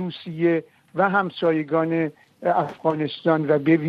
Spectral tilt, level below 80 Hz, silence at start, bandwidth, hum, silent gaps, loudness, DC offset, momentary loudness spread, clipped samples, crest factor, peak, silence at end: -9 dB/octave; -70 dBFS; 0 s; 5.2 kHz; none; none; -23 LUFS; under 0.1%; 7 LU; under 0.1%; 16 dB; -6 dBFS; 0 s